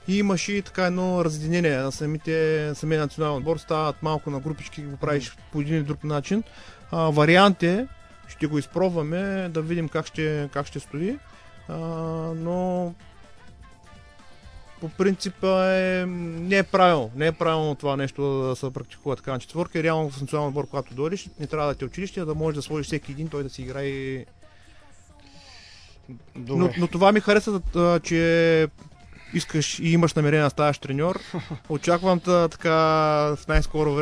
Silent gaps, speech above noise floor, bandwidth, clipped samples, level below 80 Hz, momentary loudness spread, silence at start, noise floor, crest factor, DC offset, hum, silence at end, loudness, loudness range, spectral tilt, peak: none; 26 dB; 11 kHz; under 0.1%; -42 dBFS; 12 LU; 0 s; -49 dBFS; 20 dB; under 0.1%; none; 0 s; -24 LUFS; 9 LU; -6 dB/octave; -4 dBFS